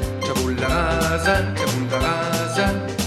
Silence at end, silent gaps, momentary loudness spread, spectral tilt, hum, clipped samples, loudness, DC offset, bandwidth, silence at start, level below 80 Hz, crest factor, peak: 0 s; none; 3 LU; -4.5 dB/octave; none; under 0.1%; -21 LUFS; under 0.1%; 16 kHz; 0 s; -32 dBFS; 16 dB; -6 dBFS